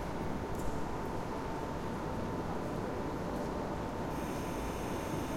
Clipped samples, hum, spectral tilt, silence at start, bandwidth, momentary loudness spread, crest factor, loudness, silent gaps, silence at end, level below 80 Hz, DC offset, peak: under 0.1%; none; -6 dB/octave; 0 s; 16.5 kHz; 1 LU; 14 dB; -38 LUFS; none; 0 s; -48 dBFS; under 0.1%; -22 dBFS